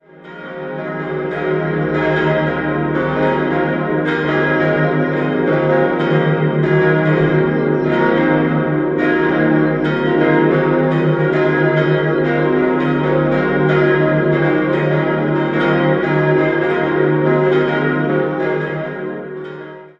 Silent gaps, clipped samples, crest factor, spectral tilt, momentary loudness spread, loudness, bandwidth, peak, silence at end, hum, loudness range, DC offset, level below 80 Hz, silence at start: none; under 0.1%; 14 dB; -9 dB/octave; 7 LU; -15 LUFS; 6 kHz; -2 dBFS; 0.1 s; none; 2 LU; under 0.1%; -46 dBFS; 0.2 s